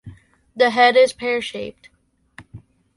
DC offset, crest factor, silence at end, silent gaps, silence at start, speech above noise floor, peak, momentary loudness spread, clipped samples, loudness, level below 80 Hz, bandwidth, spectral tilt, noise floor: under 0.1%; 18 dB; 0.4 s; none; 0.05 s; 33 dB; -4 dBFS; 18 LU; under 0.1%; -17 LUFS; -58 dBFS; 11.5 kHz; -3.5 dB/octave; -50 dBFS